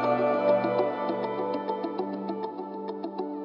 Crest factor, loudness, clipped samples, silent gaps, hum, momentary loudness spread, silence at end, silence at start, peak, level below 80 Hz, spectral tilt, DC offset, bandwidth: 16 dB; -29 LUFS; under 0.1%; none; none; 11 LU; 0 s; 0 s; -12 dBFS; -82 dBFS; -8.5 dB/octave; under 0.1%; 5.6 kHz